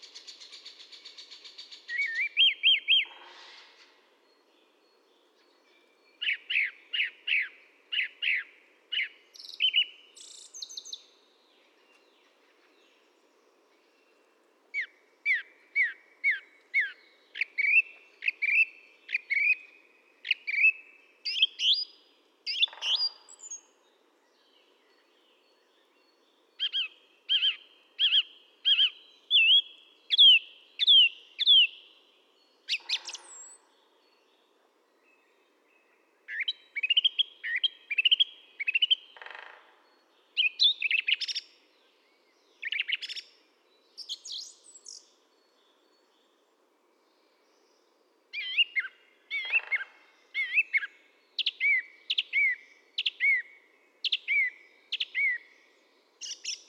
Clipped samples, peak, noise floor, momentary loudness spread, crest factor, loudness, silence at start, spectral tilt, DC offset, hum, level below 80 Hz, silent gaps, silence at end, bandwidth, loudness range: under 0.1%; -12 dBFS; -69 dBFS; 23 LU; 20 dB; -26 LUFS; 0.15 s; 6 dB/octave; under 0.1%; none; under -90 dBFS; none; 0.1 s; 12 kHz; 16 LU